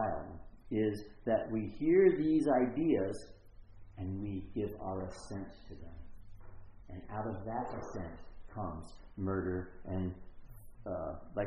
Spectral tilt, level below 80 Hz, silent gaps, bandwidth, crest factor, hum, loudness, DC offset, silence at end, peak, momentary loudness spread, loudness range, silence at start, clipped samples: -8 dB/octave; -54 dBFS; none; 10 kHz; 22 dB; none; -36 LUFS; under 0.1%; 0 s; -14 dBFS; 22 LU; 12 LU; 0 s; under 0.1%